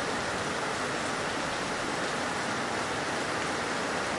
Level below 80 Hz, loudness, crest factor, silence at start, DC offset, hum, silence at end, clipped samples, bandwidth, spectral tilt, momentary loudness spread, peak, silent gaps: -58 dBFS; -31 LUFS; 14 dB; 0 s; under 0.1%; none; 0 s; under 0.1%; 11.5 kHz; -3 dB/octave; 1 LU; -18 dBFS; none